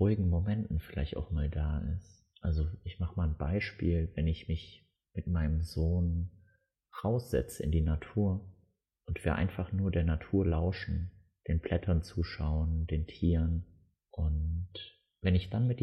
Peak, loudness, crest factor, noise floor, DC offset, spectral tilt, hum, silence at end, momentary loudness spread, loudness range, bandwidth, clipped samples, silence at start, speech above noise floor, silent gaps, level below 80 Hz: -16 dBFS; -34 LUFS; 16 dB; -71 dBFS; under 0.1%; -8 dB/octave; none; 0 s; 10 LU; 2 LU; 13 kHz; under 0.1%; 0 s; 40 dB; none; -38 dBFS